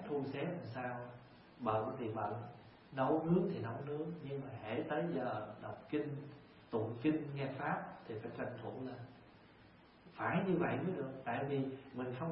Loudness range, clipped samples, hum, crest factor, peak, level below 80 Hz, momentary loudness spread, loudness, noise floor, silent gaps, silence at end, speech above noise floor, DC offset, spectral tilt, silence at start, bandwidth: 3 LU; under 0.1%; none; 18 dB; -22 dBFS; -74 dBFS; 14 LU; -40 LUFS; -63 dBFS; none; 0 s; 23 dB; under 0.1%; -6.5 dB/octave; 0 s; 5.6 kHz